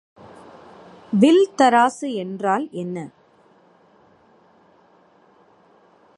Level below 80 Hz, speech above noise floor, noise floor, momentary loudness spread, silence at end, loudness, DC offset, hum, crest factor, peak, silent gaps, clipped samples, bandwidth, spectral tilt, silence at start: -72 dBFS; 37 dB; -55 dBFS; 15 LU; 3.1 s; -19 LUFS; under 0.1%; none; 20 dB; -2 dBFS; none; under 0.1%; 11.5 kHz; -5.5 dB/octave; 1.1 s